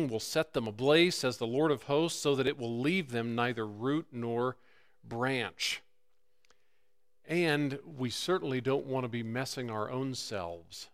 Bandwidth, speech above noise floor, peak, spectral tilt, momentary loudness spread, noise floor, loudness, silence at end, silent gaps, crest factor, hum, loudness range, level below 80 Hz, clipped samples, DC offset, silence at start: 16 kHz; 48 dB; -12 dBFS; -4.5 dB/octave; 8 LU; -80 dBFS; -32 LUFS; 0.05 s; none; 20 dB; none; 6 LU; -68 dBFS; under 0.1%; under 0.1%; 0 s